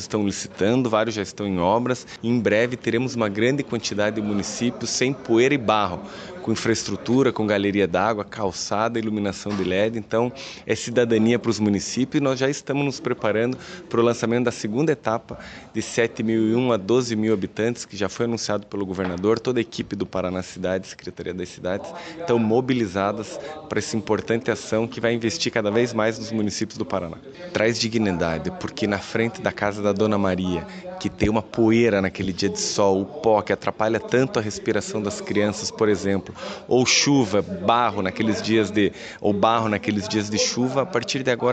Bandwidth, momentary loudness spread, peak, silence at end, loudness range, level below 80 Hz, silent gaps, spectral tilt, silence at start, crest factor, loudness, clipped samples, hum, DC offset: 9 kHz; 9 LU; -4 dBFS; 0 s; 4 LU; -52 dBFS; none; -5 dB/octave; 0 s; 18 dB; -23 LUFS; under 0.1%; none; under 0.1%